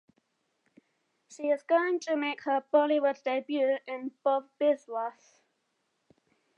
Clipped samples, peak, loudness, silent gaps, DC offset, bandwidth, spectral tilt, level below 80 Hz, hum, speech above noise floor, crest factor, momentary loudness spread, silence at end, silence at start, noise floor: under 0.1%; -12 dBFS; -29 LUFS; none; under 0.1%; 8.4 kHz; -3 dB/octave; under -90 dBFS; none; 49 dB; 20 dB; 10 LU; 1.45 s; 1.3 s; -78 dBFS